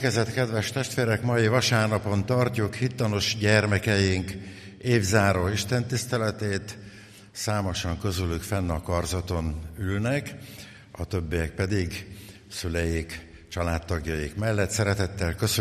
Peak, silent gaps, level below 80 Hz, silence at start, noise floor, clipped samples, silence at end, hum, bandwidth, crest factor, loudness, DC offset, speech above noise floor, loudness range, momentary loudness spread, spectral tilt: -6 dBFS; none; -42 dBFS; 0 s; -47 dBFS; under 0.1%; 0 s; none; 15 kHz; 20 dB; -26 LUFS; under 0.1%; 21 dB; 6 LU; 16 LU; -5 dB/octave